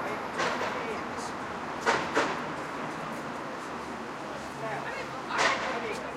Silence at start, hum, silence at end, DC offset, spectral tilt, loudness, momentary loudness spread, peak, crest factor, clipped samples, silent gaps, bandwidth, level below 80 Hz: 0 s; none; 0 s; under 0.1%; -3.5 dB/octave; -32 LUFS; 10 LU; -12 dBFS; 22 dB; under 0.1%; none; 16.5 kHz; -62 dBFS